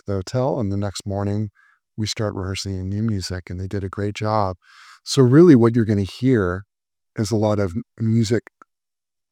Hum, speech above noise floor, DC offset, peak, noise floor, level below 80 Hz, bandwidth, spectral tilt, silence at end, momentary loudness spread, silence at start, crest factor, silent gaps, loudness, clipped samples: none; 69 dB; under 0.1%; -2 dBFS; -88 dBFS; -56 dBFS; 13.5 kHz; -6.5 dB/octave; 0.9 s; 14 LU; 0.1 s; 18 dB; none; -20 LUFS; under 0.1%